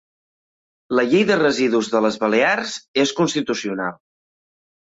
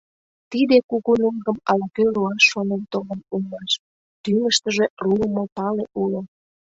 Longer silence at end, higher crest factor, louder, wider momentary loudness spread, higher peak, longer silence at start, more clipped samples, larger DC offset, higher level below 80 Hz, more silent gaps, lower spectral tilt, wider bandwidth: first, 0.95 s vs 0.5 s; about the same, 16 dB vs 20 dB; about the same, -19 LUFS vs -21 LUFS; second, 7 LU vs 12 LU; about the same, -4 dBFS vs -2 dBFS; first, 0.9 s vs 0.5 s; neither; neither; second, -64 dBFS vs -58 dBFS; second, 2.88-2.94 s vs 0.84-0.89 s, 3.79-4.24 s, 4.90-4.97 s, 5.52-5.56 s; about the same, -4 dB/octave vs -4 dB/octave; about the same, 8 kHz vs 8 kHz